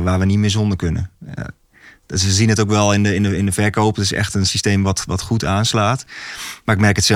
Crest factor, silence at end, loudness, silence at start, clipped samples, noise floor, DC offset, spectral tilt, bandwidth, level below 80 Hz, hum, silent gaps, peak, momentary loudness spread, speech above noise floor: 16 dB; 0 s; -17 LUFS; 0 s; under 0.1%; -47 dBFS; under 0.1%; -4.5 dB/octave; 15.5 kHz; -38 dBFS; none; none; -2 dBFS; 13 LU; 31 dB